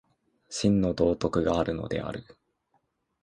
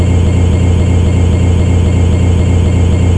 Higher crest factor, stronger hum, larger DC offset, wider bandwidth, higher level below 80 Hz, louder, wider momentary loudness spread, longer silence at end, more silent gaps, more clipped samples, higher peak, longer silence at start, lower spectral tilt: first, 18 dB vs 8 dB; neither; second, under 0.1% vs 1%; about the same, 10 kHz vs 9.6 kHz; second, -48 dBFS vs -16 dBFS; second, -27 LUFS vs -10 LUFS; first, 13 LU vs 0 LU; first, 1 s vs 0 s; neither; neither; second, -10 dBFS vs 0 dBFS; first, 0.5 s vs 0 s; second, -6 dB/octave vs -7.5 dB/octave